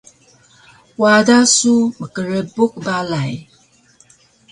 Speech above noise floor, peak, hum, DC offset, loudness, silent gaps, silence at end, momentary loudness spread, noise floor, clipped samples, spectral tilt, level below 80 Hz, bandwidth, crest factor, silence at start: 38 dB; 0 dBFS; none; under 0.1%; -15 LUFS; none; 1.1 s; 15 LU; -53 dBFS; under 0.1%; -3.5 dB/octave; -58 dBFS; 11.5 kHz; 18 dB; 1 s